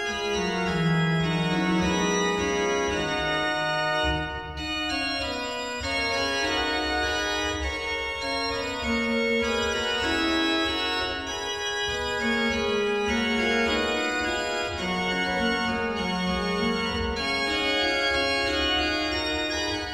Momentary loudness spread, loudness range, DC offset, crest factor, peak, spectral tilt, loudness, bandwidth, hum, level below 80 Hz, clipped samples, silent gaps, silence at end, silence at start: 5 LU; 2 LU; 0.1%; 14 dB; -12 dBFS; -4 dB/octave; -25 LUFS; 17 kHz; none; -42 dBFS; under 0.1%; none; 0 s; 0 s